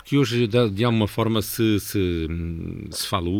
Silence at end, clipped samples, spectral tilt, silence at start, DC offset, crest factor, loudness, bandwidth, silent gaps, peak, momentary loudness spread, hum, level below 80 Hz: 0 s; under 0.1%; -5.5 dB/octave; 0.05 s; under 0.1%; 16 dB; -23 LUFS; over 20 kHz; none; -6 dBFS; 9 LU; none; -42 dBFS